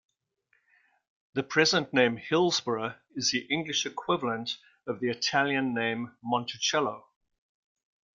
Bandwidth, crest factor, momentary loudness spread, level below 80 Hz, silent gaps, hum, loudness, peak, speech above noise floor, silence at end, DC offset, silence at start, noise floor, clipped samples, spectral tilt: 7.6 kHz; 22 dB; 11 LU; -72 dBFS; none; none; -28 LUFS; -8 dBFS; 45 dB; 1.2 s; under 0.1%; 1.35 s; -73 dBFS; under 0.1%; -3 dB/octave